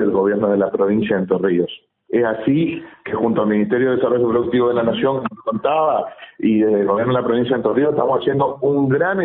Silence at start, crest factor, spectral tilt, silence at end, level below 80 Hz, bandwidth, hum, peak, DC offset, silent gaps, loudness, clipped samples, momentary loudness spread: 0 s; 14 dB; -12 dB/octave; 0 s; -56 dBFS; 4 kHz; none; -2 dBFS; under 0.1%; none; -18 LUFS; under 0.1%; 6 LU